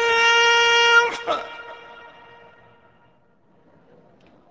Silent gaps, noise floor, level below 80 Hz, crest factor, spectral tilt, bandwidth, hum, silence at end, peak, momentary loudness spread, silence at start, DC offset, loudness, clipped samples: none; -60 dBFS; -62 dBFS; 18 dB; 0.5 dB/octave; 8 kHz; none; 2.55 s; -4 dBFS; 22 LU; 0 s; under 0.1%; -16 LUFS; under 0.1%